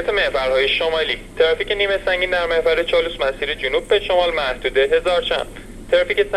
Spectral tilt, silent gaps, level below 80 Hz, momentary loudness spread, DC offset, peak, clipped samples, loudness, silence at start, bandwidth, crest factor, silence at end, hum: -3.5 dB/octave; none; -38 dBFS; 5 LU; under 0.1%; -4 dBFS; under 0.1%; -18 LUFS; 0 s; 13 kHz; 14 dB; 0 s; none